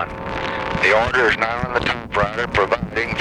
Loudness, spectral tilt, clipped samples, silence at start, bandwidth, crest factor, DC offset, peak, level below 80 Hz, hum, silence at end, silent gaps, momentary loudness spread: -19 LUFS; -5 dB/octave; under 0.1%; 0 s; 12 kHz; 16 dB; under 0.1%; -2 dBFS; -38 dBFS; none; 0 s; none; 8 LU